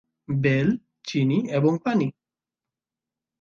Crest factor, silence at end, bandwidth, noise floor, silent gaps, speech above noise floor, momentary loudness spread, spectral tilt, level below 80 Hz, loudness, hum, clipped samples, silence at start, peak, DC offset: 16 dB; 1.3 s; 7.2 kHz; -89 dBFS; none; 67 dB; 8 LU; -7.5 dB/octave; -60 dBFS; -24 LUFS; none; under 0.1%; 0.3 s; -8 dBFS; under 0.1%